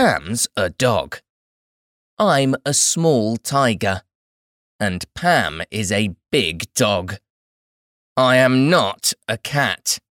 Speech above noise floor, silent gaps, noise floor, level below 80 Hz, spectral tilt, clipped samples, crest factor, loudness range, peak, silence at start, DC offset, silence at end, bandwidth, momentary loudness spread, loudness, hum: over 71 dB; 1.30-2.17 s, 4.15-4.79 s, 7.30-8.16 s; under -90 dBFS; -52 dBFS; -3.5 dB/octave; under 0.1%; 16 dB; 3 LU; -4 dBFS; 0 s; under 0.1%; 0.2 s; 18.5 kHz; 10 LU; -18 LUFS; none